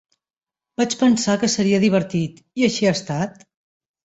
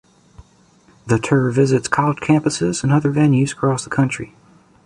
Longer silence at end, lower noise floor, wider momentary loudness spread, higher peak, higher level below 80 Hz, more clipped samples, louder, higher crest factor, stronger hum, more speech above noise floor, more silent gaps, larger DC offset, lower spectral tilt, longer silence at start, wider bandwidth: first, 0.75 s vs 0.6 s; first, under -90 dBFS vs -53 dBFS; first, 9 LU vs 5 LU; second, -4 dBFS vs 0 dBFS; second, -58 dBFS vs -50 dBFS; neither; second, -20 LUFS vs -17 LUFS; about the same, 18 dB vs 18 dB; neither; first, over 71 dB vs 36 dB; neither; neither; about the same, -5 dB/octave vs -6 dB/octave; first, 0.8 s vs 0.4 s; second, 8.2 kHz vs 11 kHz